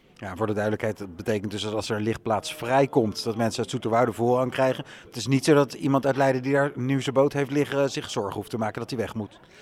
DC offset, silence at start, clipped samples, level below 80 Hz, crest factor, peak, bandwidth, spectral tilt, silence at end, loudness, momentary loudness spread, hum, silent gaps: under 0.1%; 0.2 s; under 0.1%; -60 dBFS; 18 dB; -6 dBFS; 15.5 kHz; -5.5 dB/octave; 0 s; -25 LUFS; 9 LU; none; none